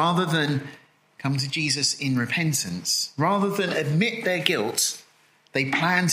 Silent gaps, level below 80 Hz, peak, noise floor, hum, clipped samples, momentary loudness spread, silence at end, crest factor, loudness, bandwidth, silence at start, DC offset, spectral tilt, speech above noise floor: none; -68 dBFS; 0 dBFS; -59 dBFS; none; under 0.1%; 6 LU; 0 s; 24 dB; -24 LUFS; 16 kHz; 0 s; under 0.1%; -3.5 dB/octave; 35 dB